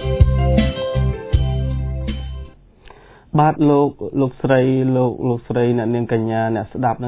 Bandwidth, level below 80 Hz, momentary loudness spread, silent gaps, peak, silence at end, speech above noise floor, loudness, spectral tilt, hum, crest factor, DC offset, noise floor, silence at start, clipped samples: 4 kHz; -26 dBFS; 9 LU; none; 0 dBFS; 0 s; 27 dB; -18 LUFS; -12 dB/octave; none; 18 dB; under 0.1%; -44 dBFS; 0 s; under 0.1%